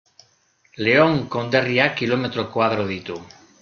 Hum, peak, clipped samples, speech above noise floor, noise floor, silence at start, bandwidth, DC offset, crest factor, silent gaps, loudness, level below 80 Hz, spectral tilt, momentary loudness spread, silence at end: none; -2 dBFS; under 0.1%; 41 dB; -61 dBFS; 0.75 s; 7 kHz; under 0.1%; 20 dB; none; -20 LUFS; -58 dBFS; -6.5 dB/octave; 12 LU; 0.35 s